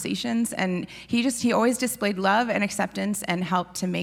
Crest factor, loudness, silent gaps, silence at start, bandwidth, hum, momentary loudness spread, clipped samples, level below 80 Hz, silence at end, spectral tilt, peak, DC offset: 16 dB; -25 LUFS; none; 0 s; 17.5 kHz; none; 6 LU; under 0.1%; -60 dBFS; 0 s; -4.5 dB/octave; -8 dBFS; under 0.1%